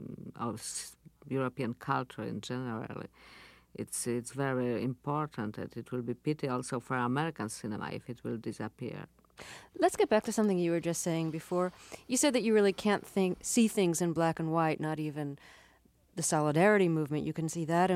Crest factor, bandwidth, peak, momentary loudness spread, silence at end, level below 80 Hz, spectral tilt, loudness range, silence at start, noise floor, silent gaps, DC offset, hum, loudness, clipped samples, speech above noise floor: 20 dB; 16 kHz; -14 dBFS; 15 LU; 0 s; -68 dBFS; -5 dB/octave; 8 LU; 0 s; -65 dBFS; none; under 0.1%; none; -32 LUFS; under 0.1%; 33 dB